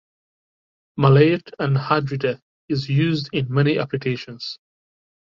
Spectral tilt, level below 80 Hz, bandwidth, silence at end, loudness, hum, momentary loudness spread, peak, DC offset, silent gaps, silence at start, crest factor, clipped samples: -8.5 dB/octave; -58 dBFS; 7 kHz; 0.75 s; -20 LUFS; none; 16 LU; -2 dBFS; under 0.1%; 2.42-2.68 s; 0.95 s; 20 dB; under 0.1%